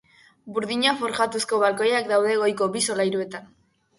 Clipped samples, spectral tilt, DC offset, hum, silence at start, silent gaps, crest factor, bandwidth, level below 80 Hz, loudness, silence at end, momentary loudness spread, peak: under 0.1%; -3 dB/octave; under 0.1%; none; 0.45 s; none; 18 dB; 11.5 kHz; -68 dBFS; -23 LUFS; 0.55 s; 9 LU; -6 dBFS